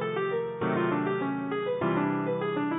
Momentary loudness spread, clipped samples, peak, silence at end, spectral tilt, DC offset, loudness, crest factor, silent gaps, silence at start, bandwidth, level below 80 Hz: 3 LU; under 0.1%; -16 dBFS; 0 s; -11 dB/octave; under 0.1%; -29 LUFS; 14 dB; none; 0 s; 4 kHz; -66 dBFS